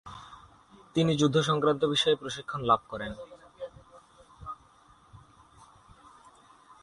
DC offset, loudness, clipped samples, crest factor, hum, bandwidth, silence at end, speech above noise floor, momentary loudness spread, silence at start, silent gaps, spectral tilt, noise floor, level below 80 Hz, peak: under 0.1%; -27 LUFS; under 0.1%; 20 dB; none; 11.5 kHz; 1.65 s; 32 dB; 22 LU; 0.05 s; none; -5 dB/octave; -59 dBFS; -60 dBFS; -10 dBFS